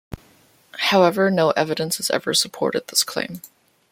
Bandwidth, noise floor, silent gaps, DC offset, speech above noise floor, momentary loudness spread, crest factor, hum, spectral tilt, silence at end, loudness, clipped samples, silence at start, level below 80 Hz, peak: 16.5 kHz; -55 dBFS; none; under 0.1%; 35 dB; 21 LU; 20 dB; none; -3 dB/octave; 0.45 s; -20 LUFS; under 0.1%; 0.1 s; -56 dBFS; -2 dBFS